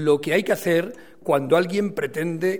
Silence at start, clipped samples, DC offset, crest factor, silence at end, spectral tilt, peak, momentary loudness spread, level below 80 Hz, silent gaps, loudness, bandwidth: 0 s; under 0.1%; 0.4%; 16 dB; 0 s; -5.5 dB/octave; -4 dBFS; 7 LU; -64 dBFS; none; -22 LUFS; 19 kHz